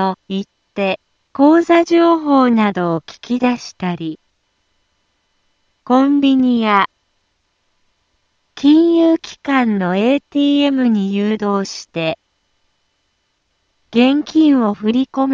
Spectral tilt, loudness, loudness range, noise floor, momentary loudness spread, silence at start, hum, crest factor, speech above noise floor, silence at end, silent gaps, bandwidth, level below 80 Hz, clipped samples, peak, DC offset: -6 dB/octave; -15 LUFS; 6 LU; -66 dBFS; 12 LU; 0 s; none; 16 dB; 52 dB; 0 s; none; 7.4 kHz; -60 dBFS; under 0.1%; 0 dBFS; under 0.1%